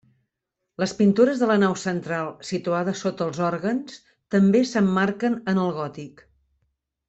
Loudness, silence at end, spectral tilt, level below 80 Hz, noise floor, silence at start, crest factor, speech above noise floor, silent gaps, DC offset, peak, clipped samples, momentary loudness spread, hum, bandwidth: -23 LUFS; 1 s; -6.5 dB/octave; -64 dBFS; -82 dBFS; 0.8 s; 18 dB; 60 dB; none; under 0.1%; -6 dBFS; under 0.1%; 11 LU; none; 8.2 kHz